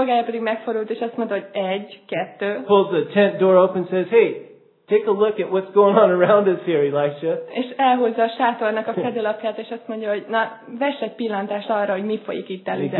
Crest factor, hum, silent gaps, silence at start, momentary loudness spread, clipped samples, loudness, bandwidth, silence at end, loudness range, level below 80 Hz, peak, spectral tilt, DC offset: 18 dB; none; none; 0 s; 12 LU; under 0.1%; -20 LUFS; 4.3 kHz; 0 s; 6 LU; -82 dBFS; -2 dBFS; -10 dB/octave; under 0.1%